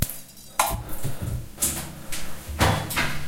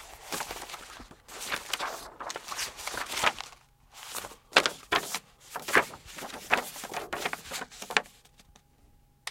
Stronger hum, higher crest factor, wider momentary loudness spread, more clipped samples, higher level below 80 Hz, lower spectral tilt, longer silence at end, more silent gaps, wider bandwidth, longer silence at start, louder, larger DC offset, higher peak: neither; second, 22 dB vs 34 dB; second, 11 LU vs 17 LU; neither; first, -36 dBFS vs -60 dBFS; first, -3.5 dB/octave vs -1 dB/octave; about the same, 0 s vs 0 s; neither; about the same, 17 kHz vs 16.5 kHz; about the same, 0 s vs 0 s; first, -27 LUFS vs -31 LUFS; first, 0.3% vs under 0.1%; about the same, -4 dBFS vs -2 dBFS